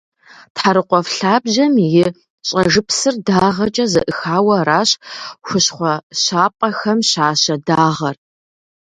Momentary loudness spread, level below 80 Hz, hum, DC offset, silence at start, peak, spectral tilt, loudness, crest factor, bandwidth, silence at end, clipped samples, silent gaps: 7 LU; -52 dBFS; none; under 0.1%; 0.55 s; 0 dBFS; -4 dB/octave; -15 LUFS; 16 dB; 11 kHz; 0.7 s; under 0.1%; 2.30-2.38 s, 6.03-6.10 s